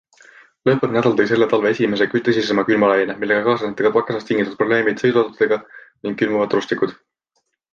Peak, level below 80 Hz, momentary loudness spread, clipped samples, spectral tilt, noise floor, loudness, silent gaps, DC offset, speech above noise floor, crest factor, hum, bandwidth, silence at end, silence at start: -2 dBFS; -60 dBFS; 6 LU; under 0.1%; -6.5 dB/octave; -71 dBFS; -18 LUFS; none; under 0.1%; 53 dB; 16 dB; none; 7.2 kHz; 0.8 s; 0.65 s